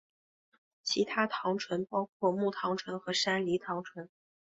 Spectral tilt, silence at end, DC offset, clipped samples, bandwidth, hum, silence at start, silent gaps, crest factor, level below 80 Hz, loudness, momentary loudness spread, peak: -4 dB/octave; 0.45 s; under 0.1%; under 0.1%; 8.2 kHz; none; 0.85 s; 2.09-2.20 s; 20 dB; -76 dBFS; -33 LUFS; 10 LU; -14 dBFS